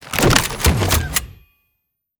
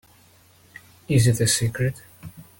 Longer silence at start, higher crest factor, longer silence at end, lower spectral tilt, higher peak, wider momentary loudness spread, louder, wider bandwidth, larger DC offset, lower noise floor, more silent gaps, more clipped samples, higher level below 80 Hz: second, 0 s vs 1.1 s; about the same, 20 dB vs 16 dB; first, 0.9 s vs 0.2 s; about the same, -3.5 dB/octave vs -4.5 dB/octave; first, 0 dBFS vs -8 dBFS; second, 7 LU vs 24 LU; first, -17 LUFS vs -21 LUFS; first, over 20 kHz vs 17 kHz; neither; first, -74 dBFS vs -55 dBFS; neither; neither; first, -28 dBFS vs -48 dBFS